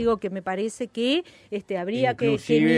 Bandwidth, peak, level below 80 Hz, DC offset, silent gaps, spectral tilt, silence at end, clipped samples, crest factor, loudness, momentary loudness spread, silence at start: 11.5 kHz; -8 dBFS; -56 dBFS; under 0.1%; none; -5.5 dB/octave; 0 s; under 0.1%; 16 dB; -26 LUFS; 9 LU; 0 s